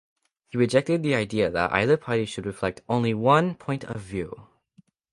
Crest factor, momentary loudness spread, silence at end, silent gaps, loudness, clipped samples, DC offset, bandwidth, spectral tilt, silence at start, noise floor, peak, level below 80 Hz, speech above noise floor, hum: 20 dB; 13 LU; 0.7 s; none; -25 LUFS; under 0.1%; under 0.1%; 11.5 kHz; -6.5 dB/octave; 0.55 s; -60 dBFS; -4 dBFS; -54 dBFS; 36 dB; none